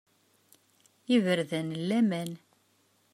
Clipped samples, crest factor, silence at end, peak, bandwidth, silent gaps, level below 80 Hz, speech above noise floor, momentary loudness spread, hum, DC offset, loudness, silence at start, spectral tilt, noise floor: under 0.1%; 18 dB; 0.8 s; -14 dBFS; 15 kHz; none; -80 dBFS; 41 dB; 18 LU; none; under 0.1%; -29 LUFS; 1.1 s; -6 dB/octave; -69 dBFS